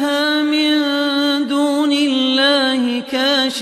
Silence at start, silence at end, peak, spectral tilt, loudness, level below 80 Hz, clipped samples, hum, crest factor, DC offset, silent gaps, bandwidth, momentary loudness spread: 0 s; 0 s; -2 dBFS; -2 dB/octave; -15 LUFS; -64 dBFS; under 0.1%; none; 14 dB; under 0.1%; none; 14 kHz; 4 LU